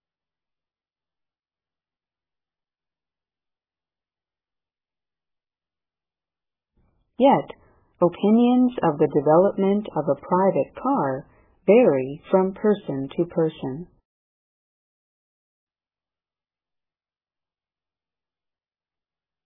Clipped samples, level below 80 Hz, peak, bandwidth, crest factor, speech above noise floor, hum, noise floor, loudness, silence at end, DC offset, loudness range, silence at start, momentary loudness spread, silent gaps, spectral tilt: under 0.1%; -64 dBFS; -4 dBFS; 3.8 kHz; 20 dB; over 70 dB; none; under -90 dBFS; -21 LUFS; 5.6 s; under 0.1%; 9 LU; 7.2 s; 11 LU; none; -11.5 dB/octave